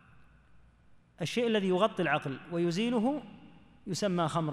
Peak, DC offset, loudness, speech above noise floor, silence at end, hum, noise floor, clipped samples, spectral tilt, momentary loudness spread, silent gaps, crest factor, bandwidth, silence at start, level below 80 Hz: -12 dBFS; under 0.1%; -31 LUFS; 31 dB; 0 s; none; -61 dBFS; under 0.1%; -5.5 dB/octave; 11 LU; none; 20 dB; 14 kHz; 1.2 s; -66 dBFS